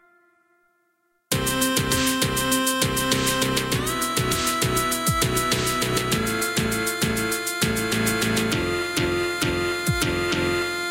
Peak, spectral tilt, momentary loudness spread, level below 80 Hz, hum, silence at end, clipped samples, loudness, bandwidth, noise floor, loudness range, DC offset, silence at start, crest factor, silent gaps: -6 dBFS; -3.5 dB/octave; 3 LU; -42 dBFS; none; 0 s; under 0.1%; -22 LUFS; 17 kHz; -69 dBFS; 1 LU; under 0.1%; 1.3 s; 18 dB; none